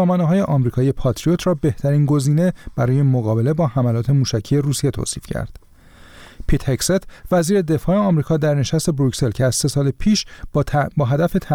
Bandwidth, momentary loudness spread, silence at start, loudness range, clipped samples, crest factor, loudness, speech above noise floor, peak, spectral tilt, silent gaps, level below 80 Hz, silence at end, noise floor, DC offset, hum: 16.5 kHz; 6 LU; 0 s; 4 LU; under 0.1%; 12 dB; -19 LUFS; 27 dB; -6 dBFS; -6.5 dB/octave; none; -34 dBFS; 0 s; -45 dBFS; 0.2%; none